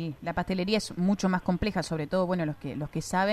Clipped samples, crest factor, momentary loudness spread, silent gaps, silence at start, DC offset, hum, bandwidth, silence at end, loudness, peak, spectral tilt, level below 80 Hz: under 0.1%; 16 dB; 6 LU; none; 0 s; under 0.1%; none; 13 kHz; 0 s; -29 LUFS; -12 dBFS; -6 dB/octave; -48 dBFS